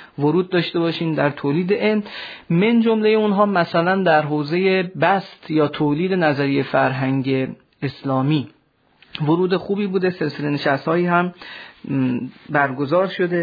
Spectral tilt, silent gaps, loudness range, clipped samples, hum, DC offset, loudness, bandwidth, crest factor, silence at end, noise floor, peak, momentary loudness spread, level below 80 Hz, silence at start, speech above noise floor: -9 dB/octave; none; 4 LU; under 0.1%; none; under 0.1%; -19 LUFS; 5 kHz; 16 dB; 0 s; -56 dBFS; -2 dBFS; 10 LU; -64 dBFS; 0 s; 37 dB